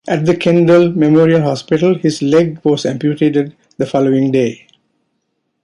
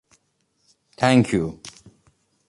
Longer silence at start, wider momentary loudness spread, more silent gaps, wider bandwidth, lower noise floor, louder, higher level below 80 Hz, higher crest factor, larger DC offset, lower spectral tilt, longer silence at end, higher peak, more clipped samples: second, 0.05 s vs 1 s; second, 8 LU vs 23 LU; neither; about the same, 11 kHz vs 11.5 kHz; about the same, -68 dBFS vs -69 dBFS; first, -13 LUFS vs -20 LUFS; about the same, -54 dBFS vs -52 dBFS; second, 12 dB vs 22 dB; neither; about the same, -7 dB/octave vs -6 dB/octave; first, 1.1 s vs 0.8 s; about the same, -2 dBFS vs -2 dBFS; neither